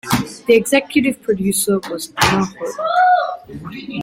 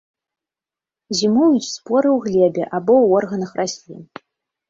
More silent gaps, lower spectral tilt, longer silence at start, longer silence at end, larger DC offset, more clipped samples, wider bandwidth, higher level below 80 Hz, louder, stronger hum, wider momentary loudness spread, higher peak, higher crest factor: neither; about the same, -4 dB/octave vs -5 dB/octave; second, 0.05 s vs 1.1 s; second, 0 s vs 0.65 s; neither; neither; first, 16.5 kHz vs 8 kHz; first, -46 dBFS vs -62 dBFS; about the same, -17 LUFS vs -17 LUFS; neither; about the same, 13 LU vs 11 LU; about the same, 0 dBFS vs -2 dBFS; about the same, 18 dB vs 16 dB